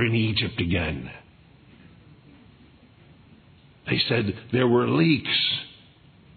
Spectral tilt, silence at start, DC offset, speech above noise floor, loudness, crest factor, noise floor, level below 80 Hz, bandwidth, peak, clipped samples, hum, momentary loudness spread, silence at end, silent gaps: -9 dB/octave; 0 s; under 0.1%; 30 dB; -23 LUFS; 20 dB; -53 dBFS; -54 dBFS; 4.6 kHz; -6 dBFS; under 0.1%; none; 14 LU; 0.7 s; none